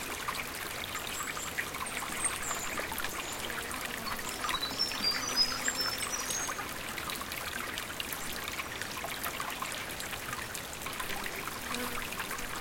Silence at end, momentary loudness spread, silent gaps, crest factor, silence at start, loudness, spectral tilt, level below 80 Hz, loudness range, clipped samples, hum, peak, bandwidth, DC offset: 0 s; 7 LU; none; 20 dB; 0 s; -34 LUFS; -1 dB/octave; -54 dBFS; 5 LU; under 0.1%; none; -16 dBFS; 17 kHz; under 0.1%